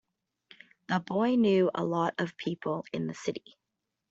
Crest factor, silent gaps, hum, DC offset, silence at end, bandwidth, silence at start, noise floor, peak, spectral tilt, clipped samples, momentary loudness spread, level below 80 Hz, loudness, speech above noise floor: 18 dB; none; none; under 0.1%; 0.7 s; 8 kHz; 0.9 s; -85 dBFS; -14 dBFS; -6.5 dB/octave; under 0.1%; 11 LU; -74 dBFS; -30 LUFS; 56 dB